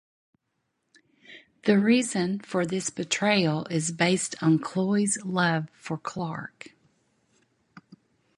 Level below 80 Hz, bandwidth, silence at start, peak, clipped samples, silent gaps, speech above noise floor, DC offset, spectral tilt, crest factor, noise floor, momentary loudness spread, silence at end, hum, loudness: -70 dBFS; 11.5 kHz; 1.3 s; -6 dBFS; under 0.1%; none; 53 dB; under 0.1%; -4.5 dB/octave; 22 dB; -78 dBFS; 11 LU; 1.7 s; none; -26 LUFS